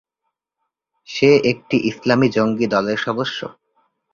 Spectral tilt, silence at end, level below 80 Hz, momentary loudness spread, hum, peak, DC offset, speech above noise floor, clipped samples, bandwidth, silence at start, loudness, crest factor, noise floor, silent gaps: -6 dB/octave; 0.6 s; -56 dBFS; 13 LU; none; -2 dBFS; under 0.1%; 60 dB; under 0.1%; 7.2 kHz; 1.1 s; -18 LUFS; 18 dB; -78 dBFS; none